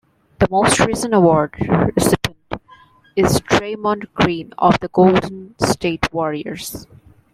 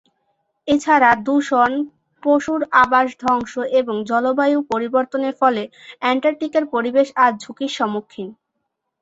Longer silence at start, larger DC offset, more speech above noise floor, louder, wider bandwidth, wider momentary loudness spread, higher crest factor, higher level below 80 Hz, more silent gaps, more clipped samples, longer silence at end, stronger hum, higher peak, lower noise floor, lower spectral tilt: second, 0.4 s vs 0.65 s; neither; second, 32 dB vs 58 dB; about the same, -17 LUFS vs -18 LUFS; first, 16 kHz vs 8 kHz; about the same, 14 LU vs 12 LU; about the same, 16 dB vs 18 dB; first, -40 dBFS vs -58 dBFS; neither; neither; second, 0.5 s vs 0.7 s; neither; about the same, 0 dBFS vs -2 dBFS; second, -48 dBFS vs -76 dBFS; about the same, -5 dB/octave vs -4.5 dB/octave